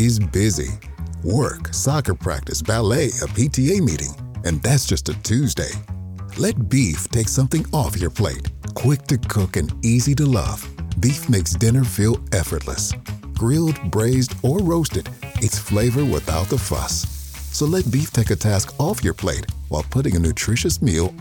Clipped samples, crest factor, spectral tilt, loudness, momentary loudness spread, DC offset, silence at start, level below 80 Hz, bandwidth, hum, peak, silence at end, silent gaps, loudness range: under 0.1%; 16 dB; -5.5 dB/octave; -20 LUFS; 9 LU; under 0.1%; 0 s; -32 dBFS; 17.5 kHz; none; -4 dBFS; 0 s; none; 2 LU